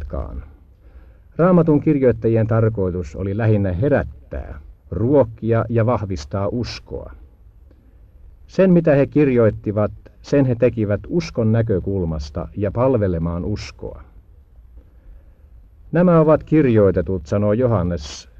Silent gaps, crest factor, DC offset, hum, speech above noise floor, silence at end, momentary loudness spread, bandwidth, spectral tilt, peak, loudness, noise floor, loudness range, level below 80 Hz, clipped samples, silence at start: none; 16 dB; under 0.1%; none; 29 dB; 0.2 s; 15 LU; 7.4 kHz; -8.5 dB/octave; -2 dBFS; -18 LUFS; -47 dBFS; 6 LU; -38 dBFS; under 0.1%; 0 s